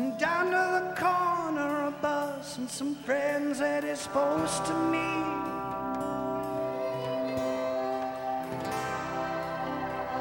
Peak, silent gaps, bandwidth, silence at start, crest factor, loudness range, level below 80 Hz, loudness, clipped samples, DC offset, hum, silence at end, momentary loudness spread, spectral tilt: -14 dBFS; none; 16.5 kHz; 0 s; 18 dB; 3 LU; -60 dBFS; -30 LUFS; under 0.1%; under 0.1%; none; 0 s; 7 LU; -4.5 dB/octave